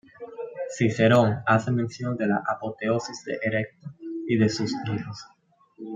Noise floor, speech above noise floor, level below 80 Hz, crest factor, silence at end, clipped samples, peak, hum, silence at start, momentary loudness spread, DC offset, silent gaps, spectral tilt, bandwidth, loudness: -46 dBFS; 22 dB; -66 dBFS; 20 dB; 0 s; under 0.1%; -6 dBFS; none; 0.2 s; 18 LU; under 0.1%; none; -6.5 dB/octave; 8.8 kHz; -25 LUFS